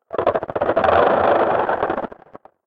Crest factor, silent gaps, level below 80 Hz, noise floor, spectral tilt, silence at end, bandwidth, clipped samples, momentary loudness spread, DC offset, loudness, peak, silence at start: 16 dB; none; -50 dBFS; -45 dBFS; -8 dB/octave; 0.6 s; 5.8 kHz; under 0.1%; 9 LU; under 0.1%; -18 LUFS; -2 dBFS; 0.15 s